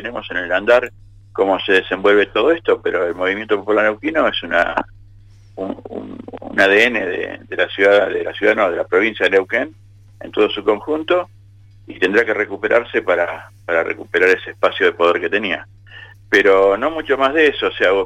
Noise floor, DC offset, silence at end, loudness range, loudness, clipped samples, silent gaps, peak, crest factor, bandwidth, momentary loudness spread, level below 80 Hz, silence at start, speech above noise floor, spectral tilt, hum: -44 dBFS; under 0.1%; 0 s; 3 LU; -16 LUFS; under 0.1%; none; -2 dBFS; 14 dB; 10.5 kHz; 13 LU; -50 dBFS; 0 s; 28 dB; -4.5 dB/octave; none